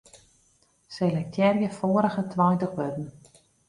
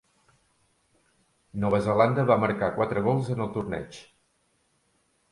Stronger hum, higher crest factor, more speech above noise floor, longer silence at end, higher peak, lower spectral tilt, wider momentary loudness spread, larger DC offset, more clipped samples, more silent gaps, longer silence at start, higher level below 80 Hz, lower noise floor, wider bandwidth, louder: neither; about the same, 18 dB vs 22 dB; second, 40 dB vs 45 dB; second, 0.6 s vs 1.3 s; second, -10 dBFS vs -6 dBFS; about the same, -8 dB/octave vs -8 dB/octave; second, 12 LU vs 15 LU; neither; neither; neither; second, 0.15 s vs 1.55 s; second, -64 dBFS vs -56 dBFS; second, -65 dBFS vs -70 dBFS; about the same, 11.5 kHz vs 11.5 kHz; about the same, -26 LUFS vs -25 LUFS